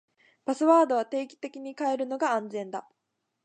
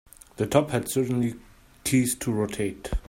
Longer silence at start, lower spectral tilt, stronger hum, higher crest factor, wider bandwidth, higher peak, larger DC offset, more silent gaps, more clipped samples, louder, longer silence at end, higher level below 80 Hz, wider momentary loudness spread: about the same, 0.45 s vs 0.4 s; about the same, -4.5 dB/octave vs -5.5 dB/octave; neither; about the same, 20 dB vs 22 dB; second, 9.4 kHz vs 16.5 kHz; about the same, -8 dBFS vs -6 dBFS; neither; neither; neither; about the same, -27 LUFS vs -26 LUFS; first, 0.65 s vs 0.1 s; second, -84 dBFS vs -40 dBFS; first, 17 LU vs 8 LU